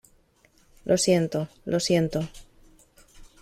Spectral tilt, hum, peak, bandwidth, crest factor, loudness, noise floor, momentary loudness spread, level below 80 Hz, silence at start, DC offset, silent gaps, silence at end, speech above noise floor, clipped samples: -5 dB/octave; none; -10 dBFS; 15.5 kHz; 18 dB; -25 LUFS; -62 dBFS; 12 LU; -54 dBFS; 0.85 s; under 0.1%; none; 0.2 s; 37 dB; under 0.1%